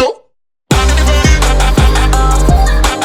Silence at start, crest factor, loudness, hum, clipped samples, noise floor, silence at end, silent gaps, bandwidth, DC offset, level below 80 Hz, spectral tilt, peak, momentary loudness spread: 0 s; 10 dB; -11 LUFS; none; under 0.1%; -55 dBFS; 0 s; none; 15 kHz; under 0.1%; -10 dBFS; -4.5 dB/octave; 0 dBFS; 4 LU